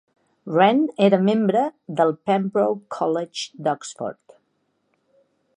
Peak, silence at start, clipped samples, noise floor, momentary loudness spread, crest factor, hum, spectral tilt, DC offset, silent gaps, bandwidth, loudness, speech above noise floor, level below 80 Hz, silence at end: -2 dBFS; 0.45 s; under 0.1%; -70 dBFS; 13 LU; 20 dB; none; -6 dB/octave; under 0.1%; none; 10.5 kHz; -21 LUFS; 50 dB; -76 dBFS; 1.45 s